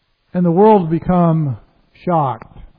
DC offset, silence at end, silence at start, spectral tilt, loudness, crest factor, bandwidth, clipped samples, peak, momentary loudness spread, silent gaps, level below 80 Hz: under 0.1%; 0.1 s; 0.35 s; -13 dB/octave; -15 LUFS; 16 dB; 4.4 kHz; under 0.1%; 0 dBFS; 16 LU; none; -42 dBFS